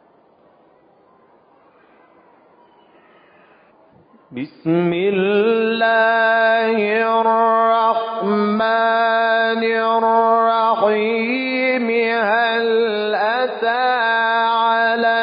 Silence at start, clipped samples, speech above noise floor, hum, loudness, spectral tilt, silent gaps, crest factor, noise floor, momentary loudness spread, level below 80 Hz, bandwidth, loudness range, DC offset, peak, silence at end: 4.3 s; under 0.1%; 37 dB; none; -16 LUFS; -10 dB/octave; none; 14 dB; -53 dBFS; 5 LU; -70 dBFS; 5.2 kHz; 6 LU; under 0.1%; -4 dBFS; 0 s